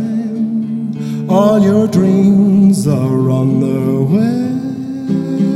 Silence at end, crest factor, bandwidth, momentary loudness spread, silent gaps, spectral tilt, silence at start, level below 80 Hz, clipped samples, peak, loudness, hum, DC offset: 0 s; 12 dB; 13 kHz; 10 LU; none; -8.5 dB/octave; 0 s; -52 dBFS; under 0.1%; 0 dBFS; -13 LUFS; none; under 0.1%